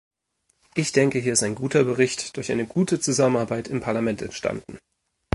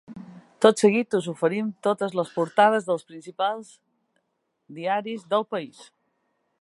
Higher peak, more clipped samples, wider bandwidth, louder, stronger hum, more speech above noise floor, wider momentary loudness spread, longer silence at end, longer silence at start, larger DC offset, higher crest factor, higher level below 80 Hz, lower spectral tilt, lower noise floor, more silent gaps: about the same, -4 dBFS vs -2 dBFS; neither; about the same, 11.5 kHz vs 11.5 kHz; about the same, -23 LUFS vs -24 LUFS; neither; second, 48 dB vs 52 dB; second, 9 LU vs 15 LU; second, 0.55 s vs 0.8 s; first, 0.75 s vs 0.1 s; neither; about the same, 20 dB vs 24 dB; first, -56 dBFS vs -76 dBFS; about the same, -4.5 dB/octave vs -5 dB/octave; second, -71 dBFS vs -76 dBFS; neither